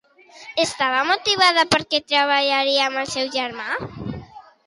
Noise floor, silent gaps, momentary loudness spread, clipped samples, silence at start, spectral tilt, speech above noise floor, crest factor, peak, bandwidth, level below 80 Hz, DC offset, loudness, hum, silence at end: -43 dBFS; none; 13 LU; under 0.1%; 0.35 s; -2.5 dB/octave; 23 dB; 20 dB; -2 dBFS; 11.5 kHz; -54 dBFS; under 0.1%; -19 LUFS; none; 0.25 s